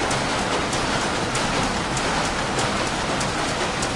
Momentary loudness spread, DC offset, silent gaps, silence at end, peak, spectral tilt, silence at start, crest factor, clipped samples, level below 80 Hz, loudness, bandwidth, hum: 1 LU; under 0.1%; none; 0 s; -8 dBFS; -3.5 dB/octave; 0 s; 14 dB; under 0.1%; -38 dBFS; -22 LUFS; 11.5 kHz; none